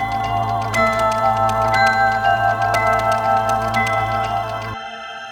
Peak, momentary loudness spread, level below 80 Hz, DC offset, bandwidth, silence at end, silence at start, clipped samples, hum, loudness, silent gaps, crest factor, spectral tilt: -4 dBFS; 10 LU; -40 dBFS; under 0.1%; 19.5 kHz; 0 s; 0 s; under 0.1%; none; -17 LUFS; none; 14 dB; -4.5 dB/octave